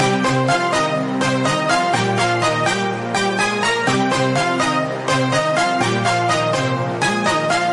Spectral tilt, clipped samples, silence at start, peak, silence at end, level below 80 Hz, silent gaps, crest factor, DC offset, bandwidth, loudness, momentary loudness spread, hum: -4.5 dB/octave; under 0.1%; 0 s; -4 dBFS; 0 s; -54 dBFS; none; 14 dB; under 0.1%; 11.5 kHz; -18 LUFS; 3 LU; none